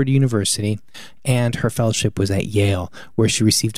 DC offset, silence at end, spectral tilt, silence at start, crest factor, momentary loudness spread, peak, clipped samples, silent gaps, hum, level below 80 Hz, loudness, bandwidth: 1%; 0 s; -5 dB/octave; 0 s; 14 dB; 9 LU; -4 dBFS; under 0.1%; none; none; -46 dBFS; -19 LUFS; 15.5 kHz